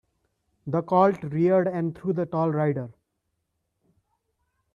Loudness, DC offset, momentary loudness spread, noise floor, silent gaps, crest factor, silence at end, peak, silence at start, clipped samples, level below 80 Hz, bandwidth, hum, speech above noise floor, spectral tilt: -24 LUFS; under 0.1%; 10 LU; -78 dBFS; none; 20 dB; 1.85 s; -8 dBFS; 0.65 s; under 0.1%; -66 dBFS; 7 kHz; none; 55 dB; -10 dB/octave